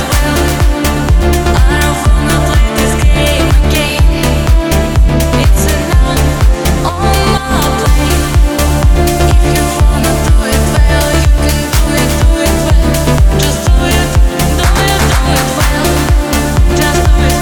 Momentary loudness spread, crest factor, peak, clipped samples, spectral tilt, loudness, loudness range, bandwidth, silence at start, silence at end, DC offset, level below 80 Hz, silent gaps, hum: 2 LU; 8 dB; 0 dBFS; under 0.1%; -5 dB/octave; -10 LUFS; 1 LU; 19.5 kHz; 0 s; 0 s; 1%; -10 dBFS; none; none